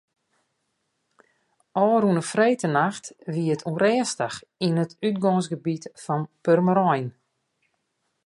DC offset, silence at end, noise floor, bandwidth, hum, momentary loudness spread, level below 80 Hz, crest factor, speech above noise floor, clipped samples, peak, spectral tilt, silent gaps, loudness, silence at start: under 0.1%; 1.2 s; -75 dBFS; 11.5 kHz; none; 10 LU; -72 dBFS; 18 dB; 52 dB; under 0.1%; -6 dBFS; -6 dB/octave; none; -24 LUFS; 1.75 s